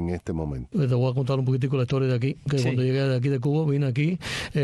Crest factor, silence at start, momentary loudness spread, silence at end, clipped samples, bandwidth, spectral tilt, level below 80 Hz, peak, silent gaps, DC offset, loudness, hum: 10 dB; 0 s; 6 LU; 0 s; under 0.1%; 11.5 kHz; -7.5 dB/octave; -48 dBFS; -14 dBFS; none; under 0.1%; -25 LUFS; none